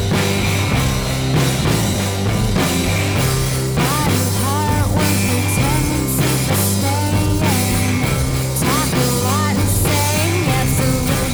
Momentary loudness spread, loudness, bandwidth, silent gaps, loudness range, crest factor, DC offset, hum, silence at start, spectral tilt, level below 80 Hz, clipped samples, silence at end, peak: 2 LU; -17 LUFS; over 20 kHz; none; 1 LU; 12 dB; under 0.1%; none; 0 s; -4.5 dB/octave; -28 dBFS; under 0.1%; 0 s; -4 dBFS